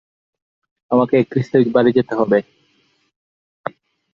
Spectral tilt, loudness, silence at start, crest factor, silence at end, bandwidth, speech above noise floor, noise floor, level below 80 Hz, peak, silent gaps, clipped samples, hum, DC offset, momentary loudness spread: -9 dB/octave; -16 LUFS; 0.9 s; 18 dB; 1.7 s; 7 kHz; 46 dB; -62 dBFS; -60 dBFS; -2 dBFS; none; under 0.1%; none; under 0.1%; 17 LU